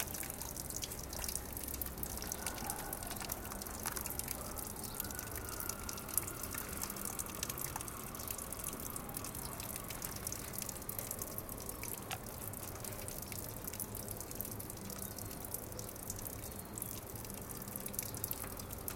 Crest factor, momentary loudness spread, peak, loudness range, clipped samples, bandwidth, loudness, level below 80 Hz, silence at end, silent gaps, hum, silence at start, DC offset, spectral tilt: 34 dB; 4 LU; -10 dBFS; 3 LU; under 0.1%; 17 kHz; -42 LUFS; -54 dBFS; 0 s; none; none; 0 s; under 0.1%; -3 dB/octave